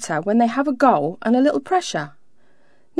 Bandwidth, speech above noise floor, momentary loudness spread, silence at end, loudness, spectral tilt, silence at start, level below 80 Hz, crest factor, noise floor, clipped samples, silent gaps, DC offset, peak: 11 kHz; 41 dB; 10 LU; 0 s; -19 LUFS; -5 dB/octave; 0 s; -64 dBFS; 18 dB; -60 dBFS; under 0.1%; none; 0.4%; -2 dBFS